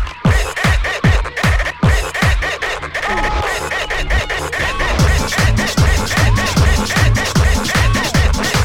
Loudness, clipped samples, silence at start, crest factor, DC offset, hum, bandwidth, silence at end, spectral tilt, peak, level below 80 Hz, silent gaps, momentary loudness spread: -15 LUFS; under 0.1%; 0 s; 14 dB; under 0.1%; none; 17 kHz; 0 s; -4.5 dB/octave; 0 dBFS; -18 dBFS; none; 5 LU